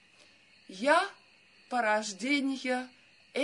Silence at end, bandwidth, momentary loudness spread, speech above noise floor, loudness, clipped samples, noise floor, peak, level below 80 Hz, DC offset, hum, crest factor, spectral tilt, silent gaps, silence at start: 0 s; 11 kHz; 12 LU; 32 dB; -30 LUFS; under 0.1%; -61 dBFS; -12 dBFS; under -90 dBFS; under 0.1%; none; 20 dB; -2.5 dB/octave; none; 0.7 s